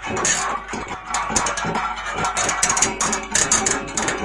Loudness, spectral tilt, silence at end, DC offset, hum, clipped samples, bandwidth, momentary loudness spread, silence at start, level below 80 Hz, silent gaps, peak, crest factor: -20 LUFS; -1.5 dB/octave; 0 s; under 0.1%; none; under 0.1%; 11.5 kHz; 8 LU; 0 s; -42 dBFS; none; -4 dBFS; 18 dB